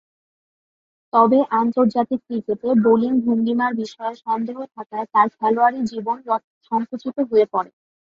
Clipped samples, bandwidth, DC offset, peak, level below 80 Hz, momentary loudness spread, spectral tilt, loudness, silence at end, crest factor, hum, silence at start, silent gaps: under 0.1%; 7.2 kHz; under 0.1%; -2 dBFS; -66 dBFS; 12 LU; -7.5 dB/octave; -20 LUFS; 0.45 s; 18 dB; none; 1.15 s; 4.86-4.90 s, 6.44-6.61 s